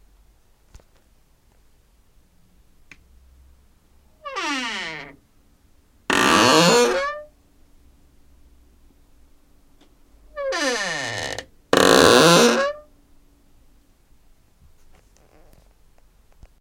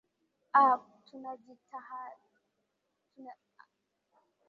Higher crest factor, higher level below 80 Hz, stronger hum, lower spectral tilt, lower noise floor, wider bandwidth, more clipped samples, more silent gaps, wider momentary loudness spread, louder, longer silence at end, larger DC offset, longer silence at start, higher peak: about the same, 24 dB vs 24 dB; first, -52 dBFS vs under -90 dBFS; neither; first, -3 dB/octave vs -1.5 dB/octave; second, -57 dBFS vs -82 dBFS; first, 17 kHz vs 5.8 kHz; neither; neither; second, 24 LU vs 27 LU; first, -18 LUFS vs -27 LUFS; first, 3.8 s vs 1.15 s; neither; first, 4.25 s vs 0.55 s; first, 0 dBFS vs -12 dBFS